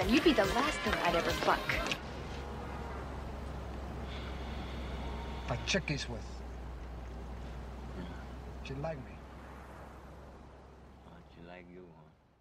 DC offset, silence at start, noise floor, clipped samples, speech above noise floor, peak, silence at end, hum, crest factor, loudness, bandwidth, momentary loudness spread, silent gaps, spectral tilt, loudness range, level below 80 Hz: under 0.1%; 0 s; -60 dBFS; under 0.1%; 27 dB; -14 dBFS; 0.3 s; none; 22 dB; -36 LUFS; 16 kHz; 22 LU; none; -4.5 dB/octave; 13 LU; -46 dBFS